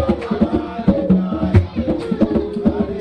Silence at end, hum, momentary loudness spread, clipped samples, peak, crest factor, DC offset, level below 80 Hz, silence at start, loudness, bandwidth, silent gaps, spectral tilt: 0 s; none; 4 LU; under 0.1%; 0 dBFS; 16 dB; under 0.1%; -32 dBFS; 0 s; -18 LUFS; 8.6 kHz; none; -9.5 dB/octave